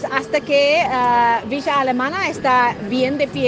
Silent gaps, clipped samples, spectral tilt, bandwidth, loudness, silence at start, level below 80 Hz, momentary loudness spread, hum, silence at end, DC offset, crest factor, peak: none; under 0.1%; -4.5 dB/octave; 9.4 kHz; -17 LUFS; 0 s; -54 dBFS; 5 LU; none; 0 s; under 0.1%; 16 dB; 0 dBFS